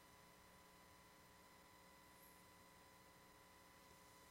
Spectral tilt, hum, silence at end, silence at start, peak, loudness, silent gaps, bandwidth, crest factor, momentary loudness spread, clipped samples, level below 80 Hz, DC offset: -3 dB/octave; none; 0 s; 0 s; -50 dBFS; -66 LUFS; none; 16 kHz; 16 dB; 1 LU; under 0.1%; -82 dBFS; under 0.1%